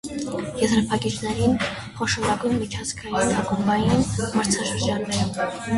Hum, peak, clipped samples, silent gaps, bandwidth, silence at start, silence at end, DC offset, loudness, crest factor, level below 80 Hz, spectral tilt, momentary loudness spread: none; -6 dBFS; under 0.1%; none; 11.5 kHz; 0.05 s; 0 s; under 0.1%; -23 LUFS; 16 dB; -42 dBFS; -4.5 dB/octave; 7 LU